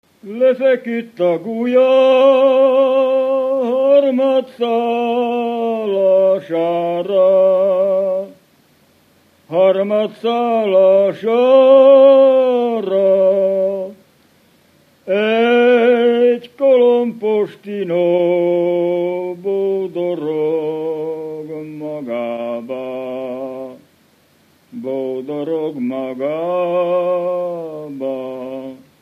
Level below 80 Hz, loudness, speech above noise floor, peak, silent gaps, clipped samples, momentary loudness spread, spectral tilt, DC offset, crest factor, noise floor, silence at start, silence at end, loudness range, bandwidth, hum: -74 dBFS; -15 LUFS; 41 dB; 0 dBFS; none; under 0.1%; 14 LU; -7 dB/octave; under 0.1%; 14 dB; -54 dBFS; 0.25 s; 0.25 s; 13 LU; 4.6 kHz; none